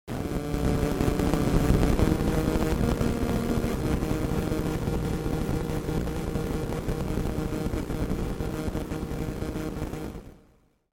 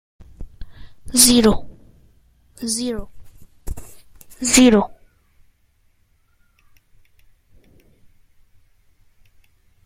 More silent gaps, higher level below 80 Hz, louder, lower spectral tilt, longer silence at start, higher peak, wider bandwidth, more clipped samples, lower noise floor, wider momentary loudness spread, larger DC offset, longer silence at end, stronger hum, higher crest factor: neither; first, -32 dBFS vs -40 dBFS; second, -28 LUFS vs -16 LUFS; first, -7 dB/octave vs -3 dB/octave; second, 0.05 s vs 0.2 s; second, -6 dBFS vs 0 dBFS; about the same, 17 kHz vs 16 kHz; neither; about the same, -62 dBFS vs -60 dBFS; second, 8 LU vs 25 LU; neither; second, 0.55 s vs 4.9 s; neither; about the same, 20 dB vs 22 dB